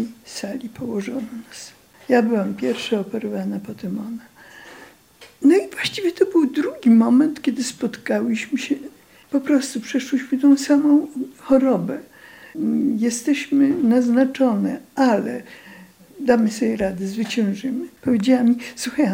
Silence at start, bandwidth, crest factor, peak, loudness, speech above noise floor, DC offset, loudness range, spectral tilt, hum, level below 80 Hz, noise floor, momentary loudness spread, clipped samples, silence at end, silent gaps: 0 s; 16.5 kHz; 16 dB; -4 dBFS; -20 LUFS; 29 dB; under 0.1%; 5 LU; -5.5 dB/octave; none; -60 dBFS; -49 dBFS; 14 LU; under 0.1%; 0 s; none